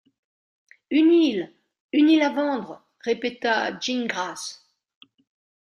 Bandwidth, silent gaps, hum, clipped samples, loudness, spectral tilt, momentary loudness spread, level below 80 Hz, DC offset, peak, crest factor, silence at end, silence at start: 11 kHz; 1.80-1.89 s; none; under 0.1%; -22 LUFS; -3.5 dB/octave; 16 LU; -74 dBFS; under 0.1%; -8 dBFS; 16 dB; 1.1 s; 0.9 s